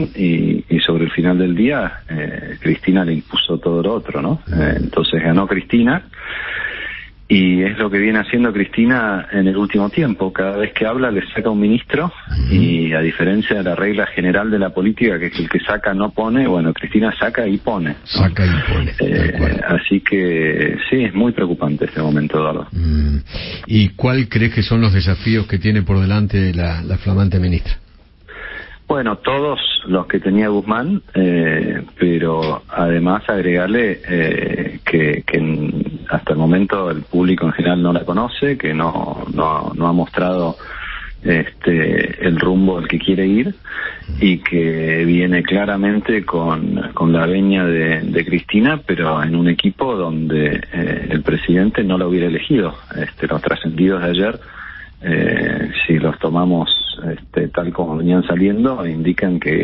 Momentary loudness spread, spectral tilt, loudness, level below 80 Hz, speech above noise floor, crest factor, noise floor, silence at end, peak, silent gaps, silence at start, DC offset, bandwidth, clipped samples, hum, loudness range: 7 LU; -11.5 dB/octave; -17 LUFS; -32 dBFS; 26 dB; 14 dB; -42 dBFS; 0 s; -2 dBFS; none; 0 s; under 0.1%; 5.8 kHz; under 0.1%; none; 2 LU